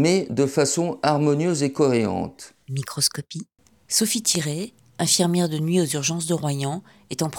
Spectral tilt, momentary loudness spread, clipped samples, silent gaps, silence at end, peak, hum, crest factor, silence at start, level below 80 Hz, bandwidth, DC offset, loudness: -4 dB/octave; 14 LU; under 0.1%; none; 0 s; -4 dBFS; none; 18 dB; 0 s; -62 dBFS; 19 kHz; under 0.1%; -22 LUFS